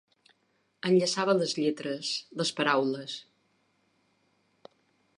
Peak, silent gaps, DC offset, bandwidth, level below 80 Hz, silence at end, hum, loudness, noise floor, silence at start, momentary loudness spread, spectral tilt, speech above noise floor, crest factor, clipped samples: -10 dBFS; none; under 0.1%; 11.5 kHz; -82 dBFS; 1.95 s; none; -28 LUFS; -73 dBFS; 0.85 s; 11 LU; -4 dB/octave; 45 dB; 20 dB; under 0.1%